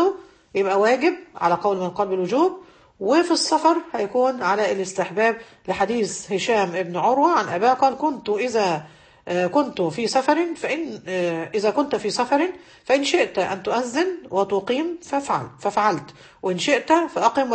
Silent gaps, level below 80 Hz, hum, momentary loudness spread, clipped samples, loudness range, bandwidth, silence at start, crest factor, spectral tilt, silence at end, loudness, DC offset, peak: none; -62 dBFS; none; 8 LU; under 0.1%; 2 LU; 8.8 kHz; 0 s; 18 dB; -4 dB/octave; 0 s; -22 LUFS; under 0.1%; -4 dBFS